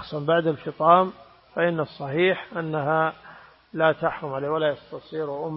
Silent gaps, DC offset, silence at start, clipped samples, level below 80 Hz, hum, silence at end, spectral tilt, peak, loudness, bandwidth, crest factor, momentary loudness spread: none; under 0.1%; 0 s; under 0.1%; -64 dBFS; none; 0 s; -10.5 dB/octave; -4 dBFS; -24 LUFS; 5.8 kHz; 22 dB; 14 LU